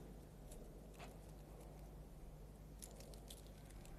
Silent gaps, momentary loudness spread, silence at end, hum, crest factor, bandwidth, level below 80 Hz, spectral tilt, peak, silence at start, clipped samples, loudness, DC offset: none; 3 LU; 0 s; none; 22 dB; 14.5 kHz; -58 dBFS; -5 dB/octave; -34 dBFS; 0 s; under 0.1%; -58 LUFS; under 0.1%